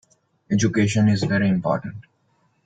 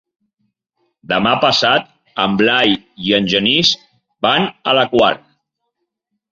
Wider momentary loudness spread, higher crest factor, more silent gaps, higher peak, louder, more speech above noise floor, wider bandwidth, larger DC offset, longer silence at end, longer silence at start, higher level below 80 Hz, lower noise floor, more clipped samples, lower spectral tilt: about the same, 7 LU vs 8 LU; about the same, 16 dB vs 16 dB; neither; second, -6 dBFS vs 0 dBFS; second, -21 LUFS vs -14 LUFS; second, 45 dB vs 59 dB; first, 9.2 kHz vs 7.8 kHz; neither; second, 0.65 s vs 1.15 s; second, 0.5 s vs 1.1 s; about the same, -54 dBFS vs -52 dBFS; second, -65 dBFS vs -74 dBFS; neither; first, -6 dB/octave vs -4 dB/octave